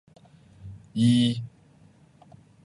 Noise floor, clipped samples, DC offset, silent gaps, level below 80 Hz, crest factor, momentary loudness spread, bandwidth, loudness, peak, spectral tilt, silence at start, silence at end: -56 dBFS; under 0.1%; under 0.1%; none; -60 dBFS; 18 dB; 25 LU; 11 kHz; -24 LUFS; -10 dBFS; -6.5 dB/octave; 0.65 s; 1.15 s